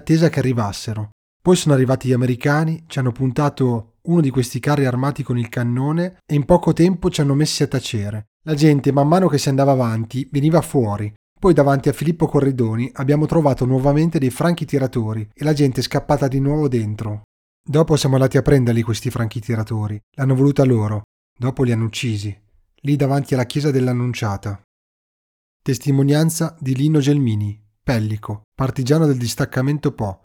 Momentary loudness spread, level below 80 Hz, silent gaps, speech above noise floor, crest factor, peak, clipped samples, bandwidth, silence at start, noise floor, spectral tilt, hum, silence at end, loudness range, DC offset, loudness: 10 LU; -42 dBFS; 1.12-1.40 s, 8.27-8.40 s, 11.16-11.36 s, 17.24-17.64 s, 20.03-20.12 s, 21.04-21.36 s, 24.64-25.60 s, 28.44-28.52 s; over 73 dB; 16 dB; 0 dBFS; under 0.1%; 17 kHz; 0.05 s; under -90 dBFS; -7 dB/octave; none; 0.2 s; 3 LU; under 0.1%; -18 LUFS